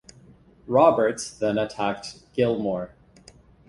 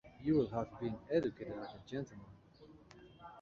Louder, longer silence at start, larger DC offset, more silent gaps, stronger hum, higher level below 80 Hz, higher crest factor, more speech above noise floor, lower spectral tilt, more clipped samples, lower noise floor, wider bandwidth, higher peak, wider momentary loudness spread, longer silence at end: first, -24 LUFS vs -39 LUFS; first, 0.65 s vs 0.05 s; neither; neither; neither; first, -58 dBFS vs -66 dBFS; about the same, 20 dB vs 18 dB; first, 30 dB vs 23 dB; second, -5.5 dB/octave vs -7 dB/octave; neither; second, -52 dBFS vs -61 dBFS; first, 11.5 kHz vs 7.2 kHz; first, -4 dBFS vs -22 dBFS; second, 14 LU vs 25 LU; first, 0.8 s vs 0 s